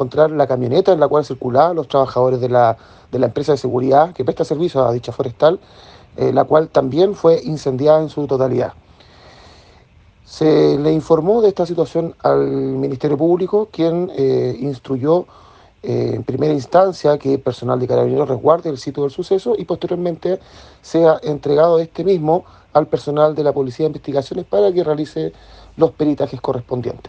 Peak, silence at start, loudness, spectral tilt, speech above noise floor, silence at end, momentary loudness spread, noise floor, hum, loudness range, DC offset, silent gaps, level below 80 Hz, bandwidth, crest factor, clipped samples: 0 dBFS; 0 s; -17 LUFS; -8 dB/octave; 32 dB; 0 s; 8 LU; -48 dBFS; none; 3 LU; under 0.1%; none; -52 dBFS; 8.6 kHz; 16 dB; under 0.1%